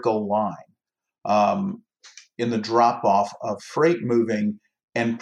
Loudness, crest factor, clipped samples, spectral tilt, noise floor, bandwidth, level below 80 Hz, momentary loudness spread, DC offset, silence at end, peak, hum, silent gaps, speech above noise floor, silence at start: -23 LUFS; 18 dB; under 0.1%; -6.5 dB/octave; -70 dBFS; 10 kHz; -76 dBFS; 14 LU; under 0.1%; 0 s; -6 dBFS; none; 4.84-4.88 s; 48 dB; 0 s